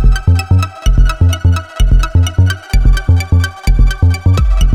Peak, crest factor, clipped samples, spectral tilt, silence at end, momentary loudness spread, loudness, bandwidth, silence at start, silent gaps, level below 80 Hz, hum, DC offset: 0 dBFS; 10 dB; under 0.1%; -6 dB/octave; 0 s; 3 LU; -13 LUFS; 12.5 kHz; 0 s; none; -12 dBFS; none; under 0.1%